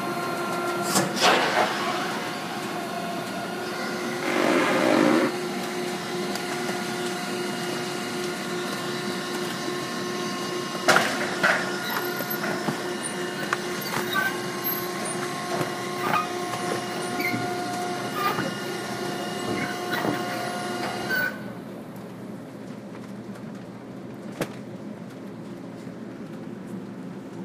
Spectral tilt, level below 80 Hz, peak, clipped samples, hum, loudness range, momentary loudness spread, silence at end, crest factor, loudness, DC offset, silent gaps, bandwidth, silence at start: -3.5 dB/octave; -68 dBFS; -4 dBFS; under 0.1%; none; 12 LU; 17 LU; 0 s; 24 dB; -26 LUFS; under 0.1%; none; 15.5 kHz; 0 s